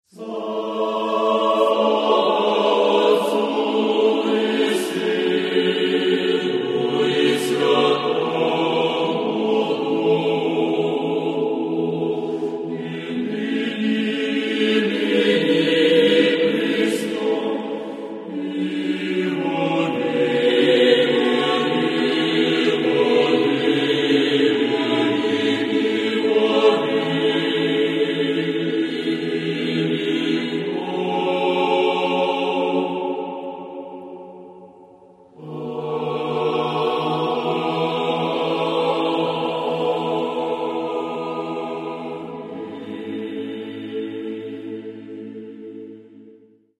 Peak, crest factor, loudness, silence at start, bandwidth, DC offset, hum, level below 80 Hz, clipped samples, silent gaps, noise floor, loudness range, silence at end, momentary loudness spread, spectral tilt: -2 dBFS; 18 dB; -20 LUFS; 0.15 s; 13 kHz; under 0.1%; none; -74 dBFS; under 0.1%; none; -51 dBFS; 10 LU; 0.45 s; 13 LU; -5.5 dB/octave